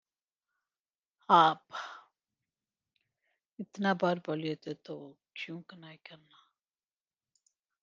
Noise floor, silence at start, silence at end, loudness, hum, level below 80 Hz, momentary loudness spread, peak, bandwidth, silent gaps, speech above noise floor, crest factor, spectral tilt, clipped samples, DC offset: under -90 dBFS; 1.3 s; 1.65 s; -30 LUFS; none; -88 dBFS; 27 LU; -8 dBFS; 7.4 kHz; none; over 58 dB; 26 dB; -6 dB/octave; under 0.1%; under 0.1%